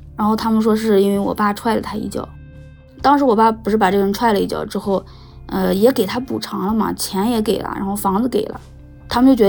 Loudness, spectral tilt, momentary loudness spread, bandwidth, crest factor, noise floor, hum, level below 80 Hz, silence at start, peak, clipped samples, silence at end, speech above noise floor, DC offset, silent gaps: -18 LUFS; -5.5 dB/octave; 9 LU; over 20 kHz; 16 dB; -40 dBFS; none; -42 dBFS; 0 s; -2 dBFS; under 0.1%; 0 s; 23 dB; under 0.1%; none